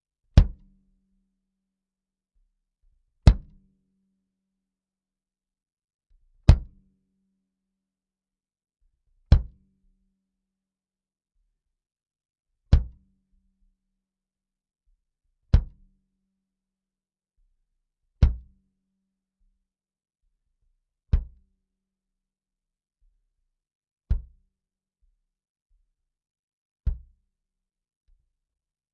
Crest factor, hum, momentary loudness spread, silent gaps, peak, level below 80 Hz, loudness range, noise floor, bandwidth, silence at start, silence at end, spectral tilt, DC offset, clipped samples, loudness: 30 dB; 50 Hz at -55 dBFS; 13 LU; 5.73-5.77 s, 5.94-5.99 s, 23.75-23.81 s, 23.91-23.96 s, 25.50-25.55 s, 25.62-25.66 s, 26.39-26.76 s; 0 dBFS; -32 dBFS; 12 LU; under -90 dBFS; 5 kHz; 0.35 s; 2 s; -8 dB/octave; under 0.1%; under 0.1%; -25 LUFS